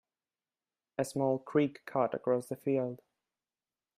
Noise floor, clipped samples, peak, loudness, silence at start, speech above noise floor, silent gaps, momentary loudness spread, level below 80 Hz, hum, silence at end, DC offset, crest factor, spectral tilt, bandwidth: under -90 dBFS; under 0.1%; -16 dBFS; -33 LUFS; 1 s; over 58 dB; none; 9 LU; -78 dBFS; none; 1 s; under 0.1%; 20 dB; -7 dB/octave; 15.5 kHz